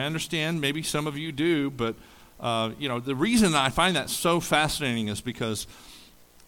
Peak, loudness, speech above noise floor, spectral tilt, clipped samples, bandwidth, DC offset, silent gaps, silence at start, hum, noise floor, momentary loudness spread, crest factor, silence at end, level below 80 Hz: -8 dBFS; -26 LUFS; 26 dB; -4 dB/octave; under 0.1%; 19 kHz; under 0.1%; none; 0 s; none; -53 dBFS; 10 LU; 20 dB; 0.45 s; -50 dBFS